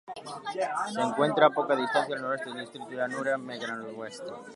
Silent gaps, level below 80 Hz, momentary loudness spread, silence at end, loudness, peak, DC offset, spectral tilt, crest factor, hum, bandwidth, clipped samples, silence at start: none; -80 dBFS; 16 LU; 0 s; -29 LUFS; -6 dBFS; under 0.1%; -4.5 dB/octave; 24 dB; none; 11.5 kHz; under 0.1%; 0.05 s